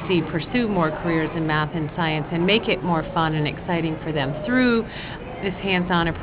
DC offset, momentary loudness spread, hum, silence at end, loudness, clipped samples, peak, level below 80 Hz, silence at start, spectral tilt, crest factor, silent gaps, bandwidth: under 0.1%; 7 LU; none; 0 s; -22 LUFS; under 0.1%; -6 dBFS; -42 dBFS; 0 s; -10 dB/octave; 18 dB; none; 4 kHz